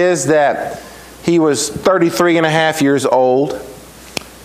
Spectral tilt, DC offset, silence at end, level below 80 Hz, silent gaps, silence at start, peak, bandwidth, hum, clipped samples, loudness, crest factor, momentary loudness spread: -4.5 dB/octave; under 0.1%; 0.1 s; -48 dBFS; none; 0 s; 0 dBFS; 16 kHz; none; under 0.1%; -14 LUFS; 14 dB; 14 LU